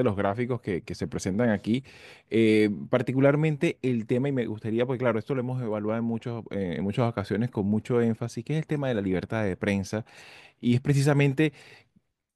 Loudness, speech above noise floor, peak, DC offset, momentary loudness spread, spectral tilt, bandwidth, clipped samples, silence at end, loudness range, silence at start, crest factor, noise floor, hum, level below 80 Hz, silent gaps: -27 LUFS; 42 dB; -8 dBFS; under 0.1%; 9 LU; -7 dB/octave; 12.5 kHz; under 0.1%; 0.6 s; 3 LU; 0 s; 18 dB; -68 dBFS; none; -60 dBFS; none